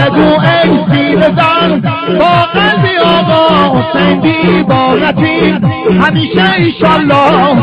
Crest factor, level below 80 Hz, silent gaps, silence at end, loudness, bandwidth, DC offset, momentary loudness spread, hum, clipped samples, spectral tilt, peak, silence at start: 8 dB; -36 dBFS; none; 0 s; -8 LUFS; 6.8 kHz; under 0.1%; 3 LU; none; under 0.1%; -8 dB/octave; 0 dBFS; 0 s